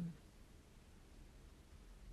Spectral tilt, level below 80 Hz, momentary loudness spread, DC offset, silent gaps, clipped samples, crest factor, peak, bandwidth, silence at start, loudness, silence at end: -6.5 dB/octave; -62 dBFS; 5 LU; under 0.1%; none; under 0.1%; 18 dB; -36 dBFS; 13.5 kHz; 0 s; -61 LUFS; 0 s